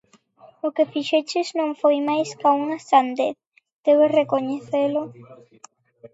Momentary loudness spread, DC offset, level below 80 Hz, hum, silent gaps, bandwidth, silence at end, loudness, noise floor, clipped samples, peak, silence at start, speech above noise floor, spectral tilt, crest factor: 9 LU; under 0.1%; -78 dBFS; none; 3.47-3.52 s, 3.73-3.83 s; 8 kHz; 0.05 s; -21 LUFS; -52 dBFS; under 0.1%; -4 dBFS; 0.65 s; 31 dB; -4.5 dB/octave; 18 dB